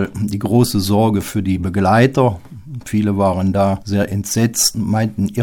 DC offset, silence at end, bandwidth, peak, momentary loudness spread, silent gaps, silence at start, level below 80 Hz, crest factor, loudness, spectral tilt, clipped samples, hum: under 0.1%; 0 s; 19 kHz; 0 dBFS; 8 LU; none; 0 s; -42 dBFS; 16 dB; -16 LUFS; -5.5 dB/octave; under 0.1%; none